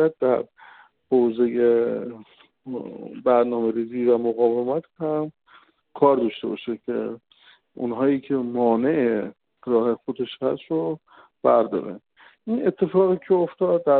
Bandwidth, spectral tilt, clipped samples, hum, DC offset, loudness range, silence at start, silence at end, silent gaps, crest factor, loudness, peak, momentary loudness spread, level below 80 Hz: 4.3 kHz; -6 dB/octave; under 0.1%; none; under 0.1%; 2 LU; 0 s; 0 s; none; 18 dB; -23 LUFS; -4 dBFS; 14 LU; -66 dBFS